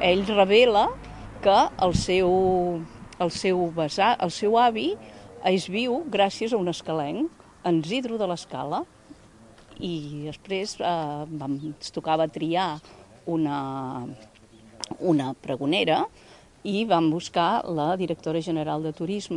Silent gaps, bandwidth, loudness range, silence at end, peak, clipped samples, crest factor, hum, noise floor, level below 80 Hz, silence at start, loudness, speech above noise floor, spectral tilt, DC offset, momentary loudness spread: none; 11.5 kHz; 7 LU; 0 s; -6 dBFS; under 0.1%; 20 dB; none; -51 dBFS; -52 dBFS; 0 s; -25 LUFS; 27 dB; -5.5 dB/octave; under 0.1%; 13 LU